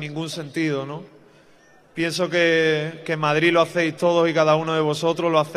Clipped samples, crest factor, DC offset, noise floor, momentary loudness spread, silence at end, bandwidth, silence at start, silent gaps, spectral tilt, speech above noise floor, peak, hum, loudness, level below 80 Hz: under 0.1%; 18 dB; under 0.1%; -53 dBFS; 11 LU; 0 s; 14 kHz; 0 s; none; -5 dB/octave; 32 dB; -4 dBFS; none; -21 LUFS; -68 dBFS